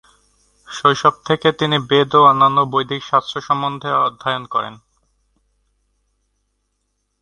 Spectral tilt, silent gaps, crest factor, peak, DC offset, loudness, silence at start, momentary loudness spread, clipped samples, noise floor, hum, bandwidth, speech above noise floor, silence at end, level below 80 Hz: -5 dB/octave; none; 18 dB; 0 dBFS; under 0.1%; -16 LUFS; 0.7 s; 11 LU; under 0.1%; -70 dBFS; 50 Hz at -60 dBFS; 11 kHz; 54 dB; 2.45 s; -58 dBFS